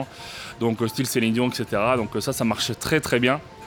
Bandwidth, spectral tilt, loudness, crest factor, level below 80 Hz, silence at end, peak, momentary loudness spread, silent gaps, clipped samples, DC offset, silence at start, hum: over 20 kHz; -4.5 dB/octave; -23 LUFS; 18 dB; -52 dBFS; 0 s; -4 dBFS; 6 LU; none; under 0.1%; under 0.1%; 0 s; none